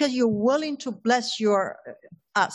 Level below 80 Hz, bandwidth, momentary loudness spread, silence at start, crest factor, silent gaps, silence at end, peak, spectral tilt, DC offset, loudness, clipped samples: -70 dBFS; 11 kHz; 10 LU; 0 s; 16 dB; none; 0 s; -8 dBFS; -4 dB/octave; under 0.1%; -24 LUFS; under 0.1%